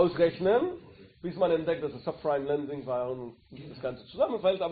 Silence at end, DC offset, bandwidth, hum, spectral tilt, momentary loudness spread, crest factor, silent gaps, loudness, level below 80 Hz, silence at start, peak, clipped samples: 0 s; under 0.1%; 4.8 kHz; none; -5 dB/octave; 14 LU; 18 dB; none; -30 LUFS; -62 dBFS; 0 s; -10 dBFS; under 0.1%